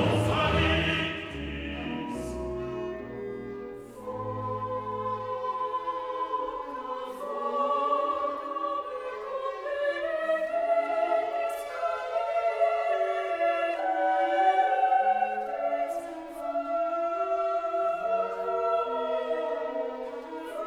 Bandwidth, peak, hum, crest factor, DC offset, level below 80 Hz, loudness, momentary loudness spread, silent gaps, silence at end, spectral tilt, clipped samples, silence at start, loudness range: 13.5 kHz; -12 dBFS; none; 16 dB; under 0.1%; -50 dBFS; -29 LUFS; 11 LU; none; 0 s; -6 dB/octave; under 0.1%; 0 s; 8 LU